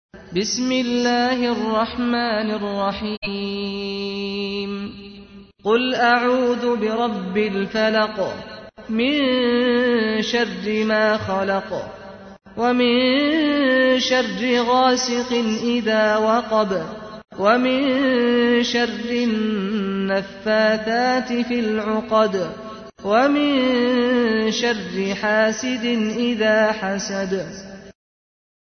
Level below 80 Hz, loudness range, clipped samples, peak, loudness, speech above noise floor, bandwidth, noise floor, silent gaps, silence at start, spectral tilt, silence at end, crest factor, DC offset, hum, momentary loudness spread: -54 dBFS; 4 LU; under 0.1%; -4 dBFS; -20 LUFS; 23 dB; 6.6 kHz; -43 dBFS; 3.17-3.22 s; 0.15 s; -4.5 dB/octave; 0.7 s; 16 dB; under 0.1%; none; 10 LU